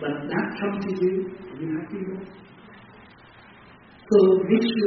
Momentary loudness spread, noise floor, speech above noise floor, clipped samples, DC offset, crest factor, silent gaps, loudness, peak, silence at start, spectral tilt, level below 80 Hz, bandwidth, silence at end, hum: 17 LU; -49 dBFS; 27 dB; under 0.1%; under 0.1%; 18 dB; none; -24 LUFS; -6 dBFS; 0 s; -5.5 dB/octave; -62 dBFS; 5.8 kHz; 0 s; none